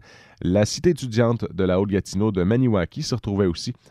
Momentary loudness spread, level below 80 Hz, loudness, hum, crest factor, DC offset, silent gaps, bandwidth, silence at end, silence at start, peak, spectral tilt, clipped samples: 6 LU; -46 dBFS; -22 LUFS; none; 16 dB; under 0.1%; none; 13 kHz; 0.2 s; 0.4 s; -6 dBFS; -6.5 dB/octave; under 0.1%